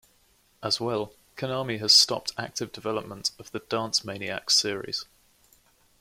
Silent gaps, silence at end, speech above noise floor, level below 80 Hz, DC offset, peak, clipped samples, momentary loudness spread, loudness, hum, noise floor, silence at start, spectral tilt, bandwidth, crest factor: none; 1 s; 36 dB; -66 dBFS; under 0.1%; -6 dBFS; under 0.1%; 16 LU; -25 LUFS; none; -64 dBFS; 0.6 s; -2 dB/octave; 16.5 kHz; 24 dB